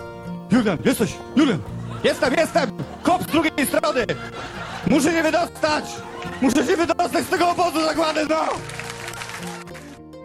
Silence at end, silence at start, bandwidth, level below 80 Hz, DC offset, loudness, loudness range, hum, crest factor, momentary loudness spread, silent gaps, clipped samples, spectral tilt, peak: 0 s; 0 s; 15 kHz; -50 dBFS; under 0.1%; -21 LUFS; 1 LU; none; 16 dB; 13 LU; none; under 0.1%; -4.5 dB/octave; -6 dBFS